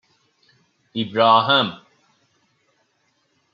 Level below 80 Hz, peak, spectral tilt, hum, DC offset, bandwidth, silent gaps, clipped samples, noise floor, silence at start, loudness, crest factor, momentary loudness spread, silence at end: -72 dBFS; -2 dBFS; -6.5 dB/octave; none; under 0.1%; 7.4 kHz; none; under 0.1%; -67 dBFS; 0.95 s; -18 LUFS; 22 dB; 14 LU; 1.8 s